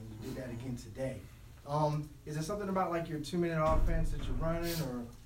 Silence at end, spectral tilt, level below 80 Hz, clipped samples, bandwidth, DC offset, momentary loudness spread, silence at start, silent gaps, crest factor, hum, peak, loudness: 0 s; -6.5 dB/octave; -40 dBFS; under 0.1%; 16 kHz; under 0.1%; 11 LU; 0 s; none; 16 dB; none; -18 dBFS; -36 LUFS